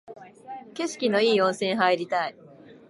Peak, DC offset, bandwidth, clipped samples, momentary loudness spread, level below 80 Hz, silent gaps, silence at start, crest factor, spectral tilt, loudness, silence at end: -6 dBFS; under 0.1%; 11.5 kHz; under 0.1%; 20 LU; -78 dBFS; none; 0.1 s; 20 dB; -4 dB/octave; -24 LUFS; 0.15 s